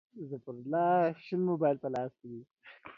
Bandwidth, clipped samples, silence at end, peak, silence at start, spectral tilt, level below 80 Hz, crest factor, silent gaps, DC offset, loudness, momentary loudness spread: 7.2 kHz; under 0.1%; 0.05 s; -16 dBFS; 0.15 s; -9 dB/octave; -78 dBFS; 16 dB; 2.51-2.56 s; under 0.1%; -32 LUFS; 20 LU